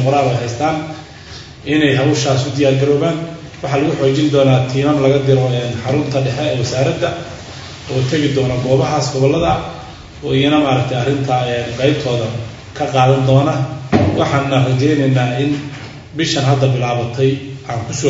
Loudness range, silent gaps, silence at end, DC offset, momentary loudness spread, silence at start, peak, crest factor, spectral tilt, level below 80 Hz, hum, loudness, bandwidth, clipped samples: 3 LU; none; 0 s; under 0.1%; 15 LU; 0 s; 0 dBFS; 14 dB; -6 dB/octave; -42 dBFS; none; -15 LUFS; 7.8 kHz; under 0.1%